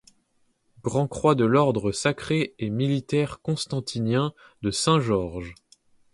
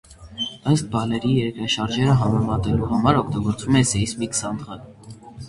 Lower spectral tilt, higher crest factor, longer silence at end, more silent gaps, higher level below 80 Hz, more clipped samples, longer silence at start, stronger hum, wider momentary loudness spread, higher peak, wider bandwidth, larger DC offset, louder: about the same, -5.5 dB/octave vs -5 dB/octave; about the same, 20 dB vs 20 dB; first, 0.6 s vs 0 s; neither; second, -52 dBFS vs -42 dBFS; neither; first, 0.85 s vs 0.1 s; neither; about the same, 10 LU vs 12 LU; second, -6 dBFS vs -2 dBFS; about the same, 11.5 kHz vs 11.5 kHz; neither; second, -25 LUFS vs -21 LUFS